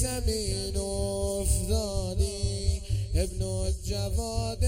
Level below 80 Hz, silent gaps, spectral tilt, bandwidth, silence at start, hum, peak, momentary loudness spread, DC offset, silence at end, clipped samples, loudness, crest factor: -32 dBFS; none; -5 dB/octave; 16.5 kHz; 0 s; none; -12 dBFS; 4 LU; under 0.1%; 0 s; under 0.1%; -30 LUFS; 16 dB